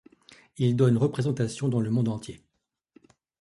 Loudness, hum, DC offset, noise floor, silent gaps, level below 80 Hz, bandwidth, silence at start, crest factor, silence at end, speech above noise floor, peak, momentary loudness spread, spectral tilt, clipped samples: -26 LUFS; none; under 0.1%; -62 dBFS; none; -60 dBFS; 11.5 kHz; 0.6 s; 18 dB; 1.05 s; 38 dB; -10 dBFS; 9 LU; -7.5 dB/octave; under 0.1%